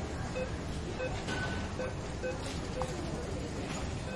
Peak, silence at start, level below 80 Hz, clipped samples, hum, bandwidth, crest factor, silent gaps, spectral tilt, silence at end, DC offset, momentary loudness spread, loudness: -20 dBFS; 0 s; -44 dBFS; under 0.1%; none; 11.5 kHz; 16 dB; none; -5 dB/octave; 0 s; under 0.1%; 3 LU; -37 LUFS